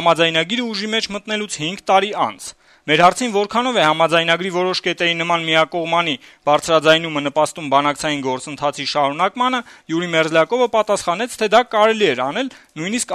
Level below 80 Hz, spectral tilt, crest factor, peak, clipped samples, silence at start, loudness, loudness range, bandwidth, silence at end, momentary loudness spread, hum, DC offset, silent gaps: -58 dBFS; -3.5 dB/octave; 16 dB; 0 dBFS; under 0.1%; 0 s; -17 LUFS; 2 LU; 13.5 kHz; 0 s; 9 LU; none; under 0.1%; none